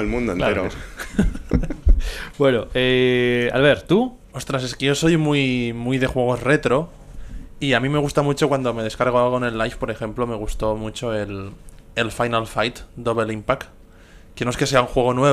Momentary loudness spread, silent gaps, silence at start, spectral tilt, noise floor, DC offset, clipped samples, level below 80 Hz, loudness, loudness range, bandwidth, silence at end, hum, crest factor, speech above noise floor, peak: 10 LU; none; 0 s; -5.5 dB/octave; -45 dBFS; under 0.1%; under 0.1%; -30 dBFS; -21 LUFS; 6 LU; 14.5 kHz; 0 s; none; 18 dB; 25 dB; -2 dBFS